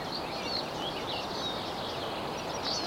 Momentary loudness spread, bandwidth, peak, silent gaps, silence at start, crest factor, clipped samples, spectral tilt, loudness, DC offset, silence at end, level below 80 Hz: 2 LU; 16.5 kHz; -20 dBFS; none; 0 s; 14 dB; under 0.1%; -3.5 dB/octave; -34 LUFS; under 0.1%; 0 s; -58 dBFS